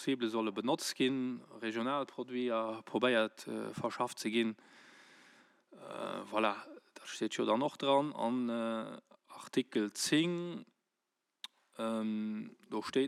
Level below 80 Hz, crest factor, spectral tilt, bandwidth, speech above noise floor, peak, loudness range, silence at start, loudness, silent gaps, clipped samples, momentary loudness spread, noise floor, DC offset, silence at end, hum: under -90 dBFS; 18 dB; -4 dB/octave; 15 kHz; 51 dB; -18 dBFS; 4 LU; 0 s; -36 LUFS; none; under 0.1%; 18 LU; -87 dBFS; under 0.1%; 0 s; none